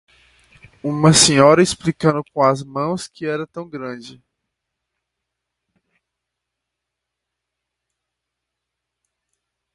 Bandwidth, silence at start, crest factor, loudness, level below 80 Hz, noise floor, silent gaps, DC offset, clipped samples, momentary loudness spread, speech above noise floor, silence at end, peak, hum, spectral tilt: 11.5 kHz; 0.85 s; 22 dB; -16 LUFS; -54 dBFS; -81 dBFS; none; under 0.1%; under 0.1%; 19 LU; 65 dB; 5.65 s; 0 dBFS; none; -4 dB/octave